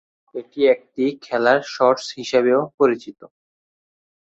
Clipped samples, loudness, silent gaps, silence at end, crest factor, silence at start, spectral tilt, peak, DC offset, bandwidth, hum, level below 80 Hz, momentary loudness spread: under 0.1%; -19 LUFS; 2.74-2.78 s; 0.95 s; 18 dB; 0.35 s; -4.5 dB/octave; -2 dBFS; under 0.1%; 8 kHz; none; -66 dBFS; 15 LU